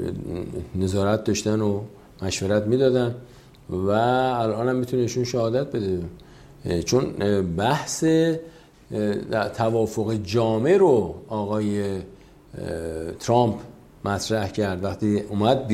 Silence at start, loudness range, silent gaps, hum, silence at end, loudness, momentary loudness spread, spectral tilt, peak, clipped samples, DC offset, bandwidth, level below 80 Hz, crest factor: 0 s; 3 LU; none; none; 0 s; -24 LUFS; 12 LU; -6 dB/octave; -6 dBFS; under 0.1%; under 0.1%; 15 kHz; -52 dBFS; 18 dB